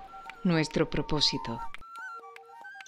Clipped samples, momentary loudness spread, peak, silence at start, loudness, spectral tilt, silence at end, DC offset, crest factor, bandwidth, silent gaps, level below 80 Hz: under 0.1%; 20 LU; -12 dBFS; 0 s; -29 LUFS; -4.5 dB/octave; 0 s; under 0.1%; 20 dB; 11.5 kHz; none; -48 dBFS